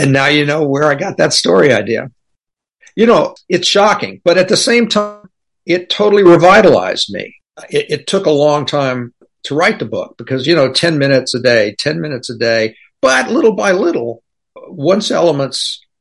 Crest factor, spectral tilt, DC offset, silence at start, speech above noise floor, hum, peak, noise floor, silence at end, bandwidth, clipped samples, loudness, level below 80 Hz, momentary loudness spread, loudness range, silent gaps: 12 dB; -4.5 dB/octave; under 0.1%; 0 s; 60 dB; none; 0 dBFS; -72 dBFS; 0.25 s; 11.5 kHz; under 0.1%; -12 LUFS; -52 dBFS; 11 LU; 4 LU; none